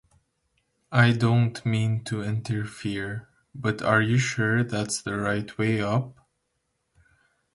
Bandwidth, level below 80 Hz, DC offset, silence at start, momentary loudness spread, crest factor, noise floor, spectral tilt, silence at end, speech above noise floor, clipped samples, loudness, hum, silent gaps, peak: 11.5 kHz; -58 dBFS; under 0.1%; 0.9 s; 10 LU; 22 dB; -76 dBFS; -6 dB/octave; 1.4 s; 52 dB; under 0.1%; -25 LUFS; none; none; -6 dBFS